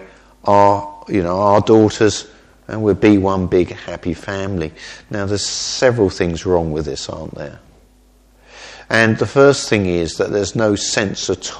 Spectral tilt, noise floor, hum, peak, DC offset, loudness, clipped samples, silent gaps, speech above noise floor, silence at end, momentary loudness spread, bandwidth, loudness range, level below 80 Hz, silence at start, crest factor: -5 dB/octave; -50 dBFS; none; 0 dBFS; under 0.1%; -16 LUFS; under 0.1%; none; 35 dB; 0 s; 15 LU; 11 kHz; 5 LU; -42 dBFS; 0 s; 16 dB